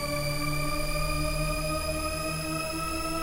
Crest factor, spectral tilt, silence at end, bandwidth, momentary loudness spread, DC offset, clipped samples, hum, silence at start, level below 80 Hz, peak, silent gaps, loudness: 12 dB; -4 dB/octave; 0 s; 16 kHz; 2 LU; under 0.1%; under 0.1%; none; 0 s; -36 dBFS; -16 dBFS; none; -30 LUFS